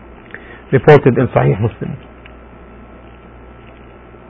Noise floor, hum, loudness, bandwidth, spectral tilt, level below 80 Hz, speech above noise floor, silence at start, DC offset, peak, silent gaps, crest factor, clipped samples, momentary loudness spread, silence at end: -38 dBFS; none; -12 LUFS; 5.8 kHz; -9.5 dB/octave; -40 dBFS; 27 dB; 0.35 s; under 0.1%; 0 dBFS; none; 16 dB; 0.3%; 25 LU; 2.35 s